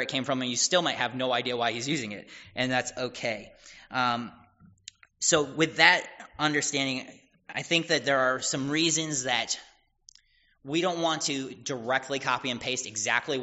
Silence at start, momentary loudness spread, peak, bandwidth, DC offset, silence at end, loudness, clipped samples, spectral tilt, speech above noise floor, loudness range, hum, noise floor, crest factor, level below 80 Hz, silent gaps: 0 s; 11 LU; -2 dBFS; 8 kHz; under 0.1%; 0 s; -27 LUFS; under 0.1%; -1.5 dB/octave; 35 dB; 5 LU; none; -63 dBFS; 28 dB; -66 dBFS; none